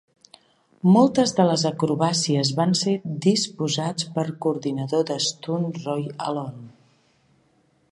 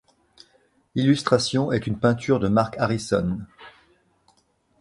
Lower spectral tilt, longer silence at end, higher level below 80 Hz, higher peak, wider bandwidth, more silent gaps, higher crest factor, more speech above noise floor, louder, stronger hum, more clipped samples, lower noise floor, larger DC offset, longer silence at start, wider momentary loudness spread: about the same, -5 dB/octave vs -6 dB/octave; first, 1.25 s vs 1.1 s; second, -68 dBFS vs -50 dBFS; about the same, -4 dBFS vs -4 dBFS; about the same, 11.5 kHz vs 11.5 kHz; neither; about the same, 20 dB vs 20 dB; about the same, 41 dB vs 43 dB; about the same, -22 LUFS vs -23 LUFS; neither; neither; about the same, -63 dBFS vs -65 dBFS; neither; about the same, 0.85 s vs 0.95 s; about the same, 10 LU vs 9 LU